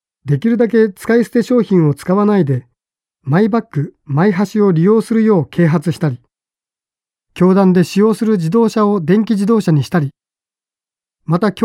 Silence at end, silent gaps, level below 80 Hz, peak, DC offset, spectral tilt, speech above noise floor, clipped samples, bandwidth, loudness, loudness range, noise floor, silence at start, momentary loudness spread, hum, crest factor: 0 s; none; -56 dBFS; -2 dBFS; under 0.1%; -8 dB/octave; over 77 dB; under 0.1%; 14 kHz; -14 LUFS; 2 LU; under -90 dBFS; 0.25 s; 8 LU; none; 12 dB